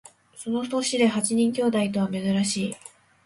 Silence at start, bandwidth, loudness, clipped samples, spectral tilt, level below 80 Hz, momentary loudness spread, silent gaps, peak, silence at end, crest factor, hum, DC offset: 0.35 s; 11.5 kHz; -24 LUFS; under 0.1%; -4.5 dB/octave; -64 dBFS; 9 LU; none; -10 dBFS; 0.35 s; 16 dB; none; under 0.1%